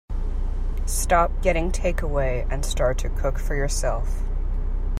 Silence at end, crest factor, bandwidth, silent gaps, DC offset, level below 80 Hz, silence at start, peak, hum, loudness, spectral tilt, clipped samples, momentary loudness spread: 0 s; 16 dB; 15 kHz; none; under 0.1%; -24 dBFS; 0.1 s; -6 dBFS; none; -25 LUFS; -4.5 dB/octave; under 0.1%; 10 LU